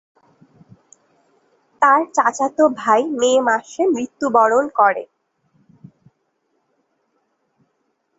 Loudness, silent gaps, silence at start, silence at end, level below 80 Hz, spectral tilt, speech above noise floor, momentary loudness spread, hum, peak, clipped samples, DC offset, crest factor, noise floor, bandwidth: -17 LUFS; none; 1.8 s; 3.15 s; -68 dBFS; -3.5 dB/octave; 53 dB; 5 LU; none; -2 dBFS; under 0.1%; under 0.1%; 20 dB; -69 dBFS; 8 kHz